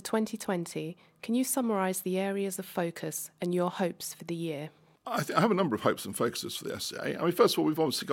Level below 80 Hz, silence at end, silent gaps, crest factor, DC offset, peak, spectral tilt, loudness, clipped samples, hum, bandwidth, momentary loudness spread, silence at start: -74 dBFS; 0 s; none; 24 dB; under 0.1%; -8 dBFS; -4.5 dB/octave; -31 LUFS; under 0.1%; none; 17 kHz; 11 LU; 0.05 s